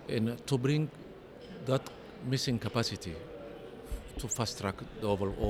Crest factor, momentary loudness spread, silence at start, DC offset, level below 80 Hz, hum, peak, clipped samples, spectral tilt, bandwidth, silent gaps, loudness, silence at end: 20 dB; 15 LU; 0 s; under 0.1%; -52 dBFS; none; -14 dBFS; under 0.1%; -5 dB/octave; 16.5 kHz; none; -34 LUFS; 0 s